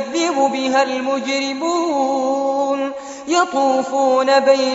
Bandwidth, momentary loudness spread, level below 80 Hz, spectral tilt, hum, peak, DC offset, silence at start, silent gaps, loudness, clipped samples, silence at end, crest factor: 8 kHz; 7 LU; -66 dBFS; -0.5 dB/octave; none; -2 dBFS; under 0.1%; 0 s; none; -17 LUFS; under 0.1%; 0 s; 14 dB